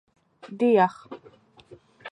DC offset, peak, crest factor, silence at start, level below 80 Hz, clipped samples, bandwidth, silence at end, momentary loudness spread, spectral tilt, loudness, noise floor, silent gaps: under 0.1%; -8 dBFS; 20 dB; 0.45 s; -74 dBFS; under 0.1%; 9.6 kHz; 0 s; 24 LU; -7.5 dB/octave; -22 LUFS; -54 dBFS; none